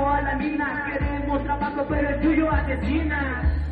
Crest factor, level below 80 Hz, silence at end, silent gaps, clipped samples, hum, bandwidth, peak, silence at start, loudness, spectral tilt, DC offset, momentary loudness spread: 14 dB; -30 dBFS; 0 s; none; under 0.1%; none; 4.9 kHz; -10 dBFS; 0 s; -24 LUFS; -9.5 dB/octave; under 0.1%; 5 LU